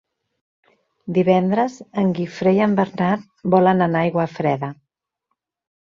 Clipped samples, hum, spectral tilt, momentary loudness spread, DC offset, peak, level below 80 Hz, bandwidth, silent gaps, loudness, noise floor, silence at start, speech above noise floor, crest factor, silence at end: under 0.1%; none; -8 dB/octave; 7 LU; under 0.1%; -4 dBFS; -60 dBFS; 7.2 kHz; none; -19 LUFS; -77 dBFS; 1.05 s; 59 dB; 18 dB; 1.1 s